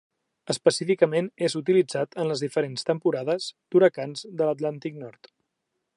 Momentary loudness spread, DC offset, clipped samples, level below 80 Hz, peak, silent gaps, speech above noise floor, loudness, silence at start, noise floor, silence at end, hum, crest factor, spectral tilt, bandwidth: 12 LU; under 0.1%; under 0.1%; -78 dBFS; -6 dBFS; none; 55 dB; -25 LUFS; 0.45 s; -80 dBFS; 0.85 s; none; 20 dB; -5 dB/octave; 11.5 kHz